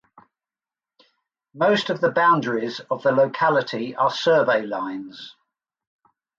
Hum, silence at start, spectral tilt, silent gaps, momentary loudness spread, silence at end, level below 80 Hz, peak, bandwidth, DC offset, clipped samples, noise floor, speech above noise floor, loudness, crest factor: none; 1.55 s; -5.5 dB/octave; none; 13 LU; 1.1 s; -72 dBFS; -6 dBFS; 7.6 kHz; under 0.1%; under 0.1%; under -90 dBFS; over 69 dB; -21 LUFS; 16 dB